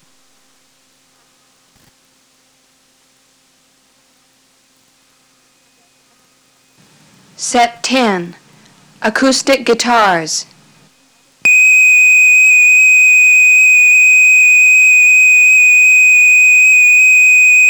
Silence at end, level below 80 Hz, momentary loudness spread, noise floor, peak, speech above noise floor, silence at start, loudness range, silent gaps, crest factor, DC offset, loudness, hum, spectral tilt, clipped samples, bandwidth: 0 s; -58 dBFS; 9 LU; -53 dBFS; -4 dBFS; 40 dB; 7.4 s; 14 LU; none; 6 dB; under 0.1%; -5 LUFS; none; -1 dB/octave; under 0.1%; over 20 kHz